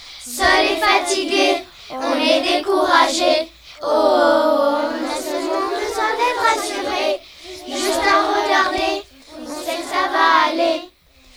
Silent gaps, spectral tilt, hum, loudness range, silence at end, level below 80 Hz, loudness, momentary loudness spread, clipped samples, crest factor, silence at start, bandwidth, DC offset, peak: none; -1.5 dB/octave; none; 3 LU; 0.5 s; -50 dBFS; -17 LUFS; 13 LU; under 0.1%; 16 dB; 0 s; over 20 kHz; under 0.1%; -2 dBFS